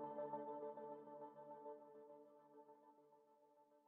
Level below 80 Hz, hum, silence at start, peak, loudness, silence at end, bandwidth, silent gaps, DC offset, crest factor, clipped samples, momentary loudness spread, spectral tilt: under -90 dBFS; none; 0 s; -38 dBFS; -55 LUFS; 0 s; 3.6 kHz; none; under 0.1%; 18 dB; under 0.1%; 17 LU; -3 dB/octave